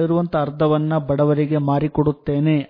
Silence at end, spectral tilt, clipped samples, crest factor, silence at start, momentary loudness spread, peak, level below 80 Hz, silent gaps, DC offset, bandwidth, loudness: 0.05 s; -11.5 dB/octave; under 0.1%; 14 dB; 0 s; 3 LU; -4 dBFS; -46 dBFS; none; under 0.1%; 5 kHz; -19 LUFS